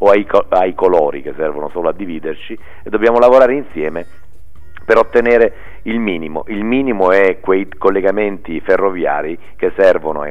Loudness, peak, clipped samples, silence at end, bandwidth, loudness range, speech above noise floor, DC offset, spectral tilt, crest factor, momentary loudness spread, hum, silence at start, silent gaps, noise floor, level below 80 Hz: -14 LUFS; 0 dBFS; under 0.1%; 0 s; 7.4 kHz; 2 LU; 28 dB; 5%; -7 dB/octave; 14 dB; 13 LU; none; 0 s; none; -42 dBFS; -40 dBFS